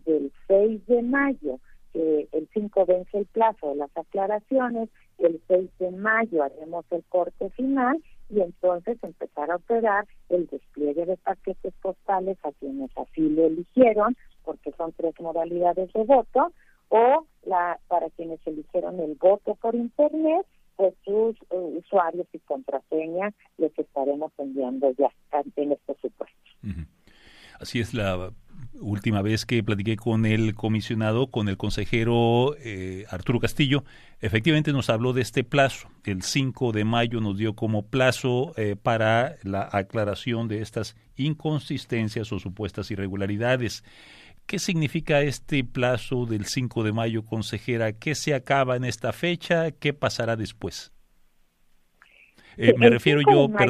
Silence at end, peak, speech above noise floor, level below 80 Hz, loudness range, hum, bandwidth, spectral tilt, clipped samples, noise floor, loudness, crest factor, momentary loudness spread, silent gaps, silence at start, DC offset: 0 s; -2 dBFS; 36 dB; -50 dBFS; 5 LU; none; 14.5 kHz; -6 dB/octave; under 0.1%; -61 dBFS; -25 LUFS; 22 dB; 12 LU; none; 0.05 s; under 0.1%